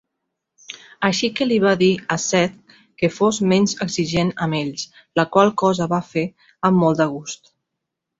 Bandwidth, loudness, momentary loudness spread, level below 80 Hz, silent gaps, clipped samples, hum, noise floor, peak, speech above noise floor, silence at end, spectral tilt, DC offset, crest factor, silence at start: 8 kHz; -19 LUFS; 14 LU; -56 dBFS; none; under 0.1%; none; -81 dBFS; -2 dBFS; 62 dB; 0.85 s; -5 dB/octave; under 0.1%; 18 dB; 0.7 s